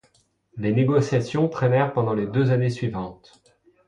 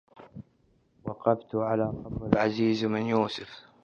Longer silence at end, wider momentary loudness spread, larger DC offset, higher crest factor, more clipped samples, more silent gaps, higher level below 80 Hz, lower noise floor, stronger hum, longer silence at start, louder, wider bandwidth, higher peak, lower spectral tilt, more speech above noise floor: first, 0.75 s vs 0.25 s; second, 10 LU vs 22 LU; neither; second, 16 dB vs 24 dB; neither; neither; about the same, -56 dBFS vs -54 dBFS; about the same, -63 dBFS vs -66 dBFS; neither; first, 0.55 s vs 0.2 s; first, -23 LUFS vs -28 LUFS; first, 9.8 kHz vs 7.2 kHz; second, -8 dBFS vs -4 dBFS; about the same, -8 dB/octave vs -7.5 dB/octave; about the same, 41 dB vs 39 dB